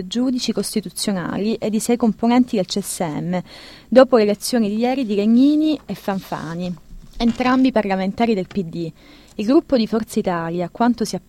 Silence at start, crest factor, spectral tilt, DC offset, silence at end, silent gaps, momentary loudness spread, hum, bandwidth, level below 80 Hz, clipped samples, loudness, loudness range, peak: 0 s; 18 dB; -5.5 dB/octave; under 0.1%; 0.1 s; none; 12 LU; none; 16 kHz; -46 dBFS; under 0.1%; -19 LUFS; 4 LU; 0 dBFS